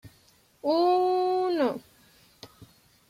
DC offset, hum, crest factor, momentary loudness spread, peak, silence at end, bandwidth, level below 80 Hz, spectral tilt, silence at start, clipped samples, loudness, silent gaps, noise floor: under 0.1%; none; 14 dB; 9 LU; -14 dBFS; 0.45 s; 15 kHz; -70 dBFS; -5.5 dB/octave; 0.05 s; under 0.1%; -25 LUFS; none; -62 dBFS